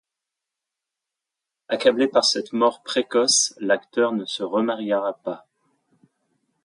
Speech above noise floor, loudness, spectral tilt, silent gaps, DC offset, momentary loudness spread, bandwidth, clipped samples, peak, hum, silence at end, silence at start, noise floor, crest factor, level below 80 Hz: 64 dB; -21 LUFS; -2 dB/octave; none; under 0.1%; 11 LU; 11.5 kHz; under 0.1%; -4 dBFS; none; 1.25 s; 1.7 s; -86 dBFS; 20 dB; -76 dBFS